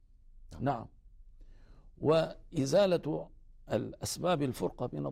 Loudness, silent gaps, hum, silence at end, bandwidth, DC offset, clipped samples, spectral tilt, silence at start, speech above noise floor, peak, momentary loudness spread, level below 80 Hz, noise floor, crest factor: -33 LUFS; none; none; 0 s; 16 kHz; under 0.1%; under 0.1%; -5.5 dB/octave; 0.35 s; 23 dB; -16 dBFS; 11 LU; -54 dBFS; -55 dBFS; 18 dB